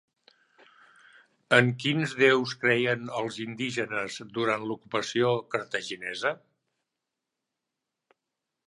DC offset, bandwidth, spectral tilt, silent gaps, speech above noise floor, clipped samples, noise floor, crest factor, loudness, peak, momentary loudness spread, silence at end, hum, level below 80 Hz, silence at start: under 0.1%; 11.5 kHz; -5 dB/octave; none; 59 dB; under 0.1%; -86 dBFS; 26 dB; -27 LUFS; -4 dBFS; 11 LU; 2.3 s; none; -74 dBFS; 1.5 s